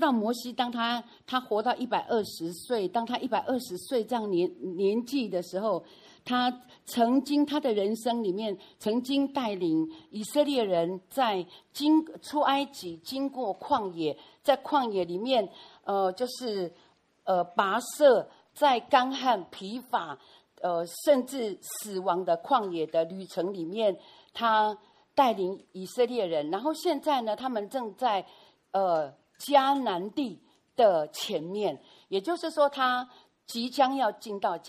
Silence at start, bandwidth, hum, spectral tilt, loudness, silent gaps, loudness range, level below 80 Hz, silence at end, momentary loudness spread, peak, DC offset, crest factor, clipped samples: 0 s; 15 kHz; none; -4.5 dB/octave; -29 LUFS; none; 3 LU; -76 dBFS; 0 s; 10 LU; -8 dBFS; under 0.1%; 20 dB; under 0.1%